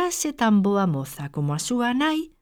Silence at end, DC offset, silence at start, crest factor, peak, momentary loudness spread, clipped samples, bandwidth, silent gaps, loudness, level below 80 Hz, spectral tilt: 0.15 s; under 0.1%; 0 s; 12 dB; -10 dBFS; 9 LU; under 0.1%; 18.5 kHz; none; -23 LUFS; -56 dBFS; -5 dB/octave